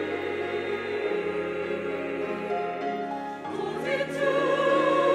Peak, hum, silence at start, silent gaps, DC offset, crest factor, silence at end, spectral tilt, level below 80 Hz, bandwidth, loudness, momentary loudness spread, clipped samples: -12 dBFS; none; 0 s; none; under 0.1%; 16 dB; 0 s; -5.5 dB/octave; -70 dBFS; 12.5 kHz; -28 LUFS; 9 LU; under 0.1%